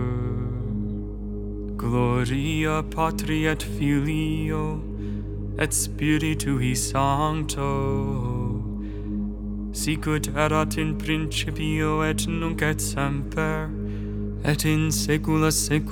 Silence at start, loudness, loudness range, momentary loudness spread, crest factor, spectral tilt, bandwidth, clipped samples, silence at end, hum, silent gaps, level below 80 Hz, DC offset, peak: 0 s; -25 LUFS; 2 LU; 9 LU; 20 dB; -5 dB/octave; 19.5 kHz; under 0.1%; 0 s; 50 Hz at -55 dBFS; none; -34 dBFS; under 0.1%; -4 dBFS